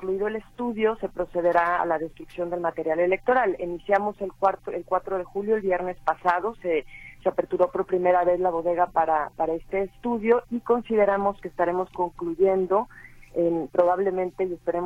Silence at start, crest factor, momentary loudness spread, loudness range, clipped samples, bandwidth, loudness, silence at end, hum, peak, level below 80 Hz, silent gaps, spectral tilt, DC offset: 0 s; 16 dB; 8 LU; 2 LU; under 0.1%; 10.5 kHz; -25 LUFS; 0 s; none; -8 dBFS; -52 dBFS; none; -7.5 dB/octave; under 0.1%